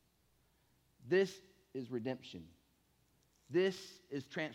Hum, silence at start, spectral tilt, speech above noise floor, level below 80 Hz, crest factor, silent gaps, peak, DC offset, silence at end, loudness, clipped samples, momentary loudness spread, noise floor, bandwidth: none; 1.05 s; -5.5 dB/octave; 37 dB; -80 dBFS; 20 dB; none; -20 dBFS; under 0.1%; 0 s; -39 LUFS; under 0.1%; 17 LU; -75 dBFS; 13.5 kHz